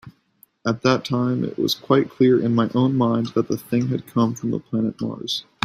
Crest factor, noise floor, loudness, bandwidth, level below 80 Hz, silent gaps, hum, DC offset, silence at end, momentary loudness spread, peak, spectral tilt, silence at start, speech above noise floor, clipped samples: 20 dB; -58 dBFS; -21 LUFS; 15.5 kHz; -60 dBFS; none; none; under 0.1%; 0.2 s; 9 LU; -2 dBFS; -6.5 dB/octave; 0.05 s; 38 dB; under 0.1%